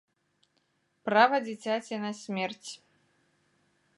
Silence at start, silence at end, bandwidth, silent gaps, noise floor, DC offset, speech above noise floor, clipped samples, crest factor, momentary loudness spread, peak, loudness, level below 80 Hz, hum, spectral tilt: 1.05 s; 1.2 s; 11.5 kHz; none; -74 dBFS; under 0.1%; 45 dB; under 0.1%; 24 dB; 20 LU; -8 dBFS; -29 LUFS; -86 dBFS; none; -4 dB/octave